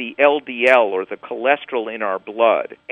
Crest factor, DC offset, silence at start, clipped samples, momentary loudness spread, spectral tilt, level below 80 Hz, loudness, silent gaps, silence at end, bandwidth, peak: 18 dB; under 0.1%; 0 s; under 0.1%; 10 LU; -4.5 dB/octave; -72 dBFS; -18 LUFS; none; 0.15 s; 9.2 kHz; 0 dBFS